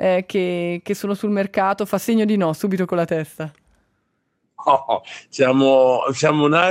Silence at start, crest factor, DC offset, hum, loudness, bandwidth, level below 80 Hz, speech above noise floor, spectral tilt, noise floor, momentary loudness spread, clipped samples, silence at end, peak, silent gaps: 0 s; 18 dB; under 0.1%; none; -19 LUFS; 16 kHz; -66 dBFS; 52 dB; -5.5 dB/octave; -70 dBFS; 10 LU; under 0.1%; 0 s; -2 dBFS; none